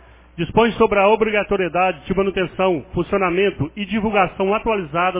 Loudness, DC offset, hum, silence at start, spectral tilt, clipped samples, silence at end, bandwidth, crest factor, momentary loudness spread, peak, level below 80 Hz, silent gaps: -19 LUFS; under 0.1%; none; 0.35 s; -10 dB/octave; under 0.1%; 0 s; 3.9 kHz; 16 dB; 7 LU; -2 dBFS; -42 dBFS; none